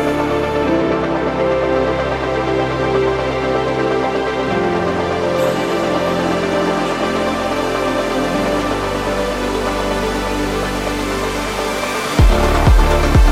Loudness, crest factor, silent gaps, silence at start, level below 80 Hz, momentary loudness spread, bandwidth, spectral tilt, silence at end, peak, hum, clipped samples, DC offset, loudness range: -17 LUFS; 16 dB; none; 0 s; -22 dBFS; 5 LU; 16 kHz; -5.5 dB/octave; 0 s; 0 dBFS; none; under 0.1%; under 0.1%; 2 LU